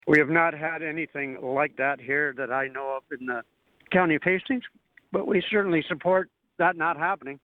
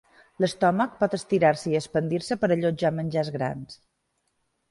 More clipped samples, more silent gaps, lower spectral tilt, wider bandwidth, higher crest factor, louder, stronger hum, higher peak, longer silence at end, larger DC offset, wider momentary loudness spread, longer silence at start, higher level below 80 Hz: neither; neither; about the same, -7.5 dB/octave vs -6.5 dB/octave; second, 8 kHz vs 11.5 kHz; about the same, 20 dB vs 18 dB; about the same, -26 LUFS vs -25 LUFS; neither; about the same, -8 dBFS vs -8 dBFS; second, 0.1 s vs 0.95 s; neither; about the same, 10 LU vs 8 LU; second, 0.05 s vs 0.4 s; second, -66 dBFS vs -60 dBFS